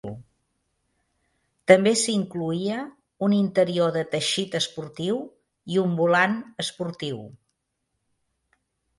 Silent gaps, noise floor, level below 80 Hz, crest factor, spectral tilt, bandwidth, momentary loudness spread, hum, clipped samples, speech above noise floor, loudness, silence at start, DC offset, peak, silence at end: none; -78 dBFS; -66 dBFS; 24 dB; -4.5 dB/octave; 11.5 kHz; 14 LU; none; under 0.1%; 55 dB; -24 LUFS; 0.05 s; under 0.1%; 0 dBFS; 1.65 s